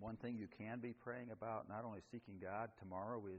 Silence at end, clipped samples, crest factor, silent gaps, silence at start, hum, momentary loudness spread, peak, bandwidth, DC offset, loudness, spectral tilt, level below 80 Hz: 0 s; under 0.1%; 16 dB; none; 0 s; none; 4 LU; -32 dBFS; 6.8 kHz; under 0.1%; -50 LUFS; -7 dB/octave; -78 dBFS